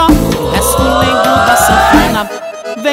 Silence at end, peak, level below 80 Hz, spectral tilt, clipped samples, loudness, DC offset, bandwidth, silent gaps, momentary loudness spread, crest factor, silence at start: 0 s; 0 dBFS; -22 dBFS; -4 dB/octave; under 0.1%; -9 LUFS; under 0.1%; 16.5 kHz; none; 11 LU; 10 dB; 0 s